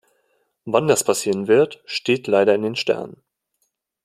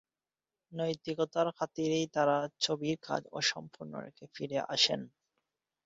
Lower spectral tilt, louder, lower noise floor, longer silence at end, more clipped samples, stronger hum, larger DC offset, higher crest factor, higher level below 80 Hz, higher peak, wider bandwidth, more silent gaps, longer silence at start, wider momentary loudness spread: first, -4 dB/octave vs -2.5 dB/octave; first, -19 LUFS vs -32 LUFS; second, -72 dBFS vs under -90 dBFS; first, 0.9 s vs 0.75 s; neither; neither; neither; about the same, 18 dB vs 22 dB; first, -66 dBFS vs -76 dBFS; first, -2 dBFS vs -12 dBFS; first, 15.5 kHz vs 7.6 kHz; neither; about the same, 0.65 s vs 0.7 s; second, 9 LU vs 16 LU